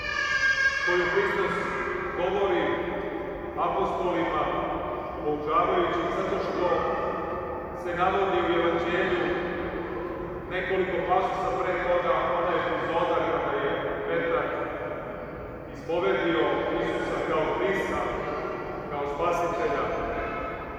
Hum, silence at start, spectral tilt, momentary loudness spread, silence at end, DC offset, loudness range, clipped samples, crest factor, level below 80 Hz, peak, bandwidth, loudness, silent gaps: none; 0 s; -5.5 dB/octave; 9 LU; 0 s; under 0.1%; 2 LU; under 0.1%; 18 dB; -48 dBFS; -10 dBFS; 13.5 kHz; -27 LUFS; none